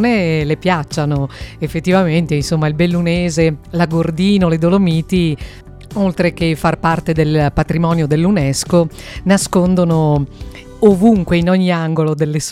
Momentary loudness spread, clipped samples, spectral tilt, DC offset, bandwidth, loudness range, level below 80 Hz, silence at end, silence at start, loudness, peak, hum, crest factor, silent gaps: 7 LU; under 0.1%; -6.5 dB/octave; under 0.1%; 14 kHz; 2 LU; -34 dBFS; 0 s; 0 s; -15 LUFS; 0 dBFS; none; 14 dB; none